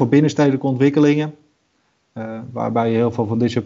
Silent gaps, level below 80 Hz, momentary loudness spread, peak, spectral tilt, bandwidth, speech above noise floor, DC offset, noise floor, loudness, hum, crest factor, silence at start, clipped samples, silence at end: none; -60 dBFS; 16 LU; -2 dBFS; -7.5 dB/octave; 7.6 kHz; 48 dB; under 0.1%; -65 dBFS; -18 LUFS; none; 16 dB; 0 s; under 0.1%; 0 s